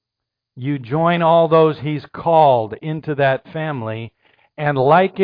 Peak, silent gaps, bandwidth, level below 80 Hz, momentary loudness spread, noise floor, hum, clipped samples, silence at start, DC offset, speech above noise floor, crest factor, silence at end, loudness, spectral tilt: -2 dBFS; none; 5.2 kHz; -58 dBFS; 13 LU; -82 dBFS; none; under 0.1%; 0.55 s; under 0.1%; 66 dB; 16 dB; 0 s; -17 LUFS; -10 dB/octave